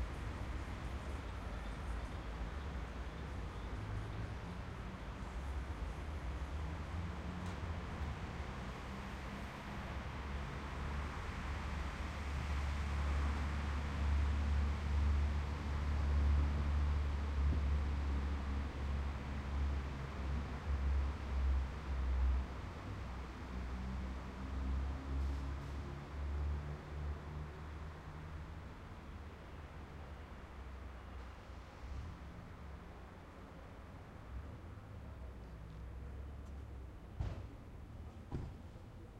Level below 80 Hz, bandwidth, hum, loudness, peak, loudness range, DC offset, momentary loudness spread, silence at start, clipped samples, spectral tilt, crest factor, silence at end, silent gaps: -42 dBFS; 9 kHz; none; -43 LUFS; -24 dBFS; 14 LU; under 0.1%; 15 LU; 0 s; under 0.1%; -7 dB/octave; 16 dB; 0 s; none